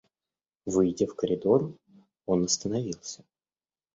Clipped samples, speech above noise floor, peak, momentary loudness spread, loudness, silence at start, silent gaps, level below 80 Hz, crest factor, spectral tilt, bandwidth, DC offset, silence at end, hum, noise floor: under 0.1%; over 63 dB; -10 dBFS; 16 LU; -28 LUFS; 0.65 s; none; -60 dBFS; 20 dB; -5.5 dB/octave; 8 kHz; under 0.1%; 0.8 s; none; under -90 dBFS